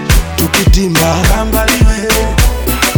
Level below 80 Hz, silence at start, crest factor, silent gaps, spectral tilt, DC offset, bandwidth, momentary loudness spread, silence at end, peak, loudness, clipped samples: -14 dBFS; 0 s; 10 dB; none; -4 dB/octave; under 0.1%; over 20 kHz; 3 LU; 0 s; 0 dBFS; -11 LUFS; under 0.1%